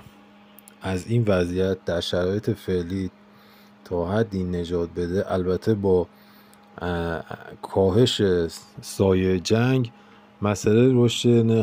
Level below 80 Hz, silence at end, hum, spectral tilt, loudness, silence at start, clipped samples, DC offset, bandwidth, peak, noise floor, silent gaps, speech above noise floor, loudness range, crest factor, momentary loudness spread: -54 dBFS; 0 s; none; -6.5 dB/octave; -23 LUFS; 0.8 s; under 0.1%; under 0.1%; 16 kHz; -6 dBFS; -51 dBFS; none; 29 dB; 5 LU; 16 dB; 13 LU